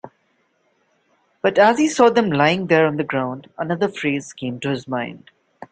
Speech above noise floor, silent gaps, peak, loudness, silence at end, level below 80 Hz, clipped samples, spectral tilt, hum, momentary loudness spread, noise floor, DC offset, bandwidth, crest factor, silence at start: 46 dB; none; -2 dBFS; -19 LUFS; 0.05 s; -62 dBFS; under 0.1%; -5.5 dB/octave; none; 12 LU; -65 dBFS; under 0.1%; 9.2 kHz; 18 dB; 0.05 s